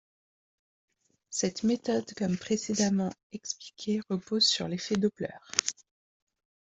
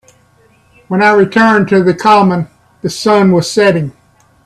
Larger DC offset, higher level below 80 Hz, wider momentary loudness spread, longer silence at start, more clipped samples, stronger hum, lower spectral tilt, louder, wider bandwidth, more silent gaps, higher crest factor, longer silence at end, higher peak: neither; second, -68 dBFS vs -52 dBFS; about the same, 13 LU vs 12 LU; first, 1.3 s vs 0.9 s; neither; neither; second, -3.5 dB/octave vs -6 dB/octave; second, -30 LUFS vs -10 LUFS; second, 8.2 kHz vs 13 kHz; first, 3.23-3.30 s vs none; first, 30 dB vs 12 dB; first, 1 s vs 0.55 s; about the same, -2 dBFS vs 0 dBFS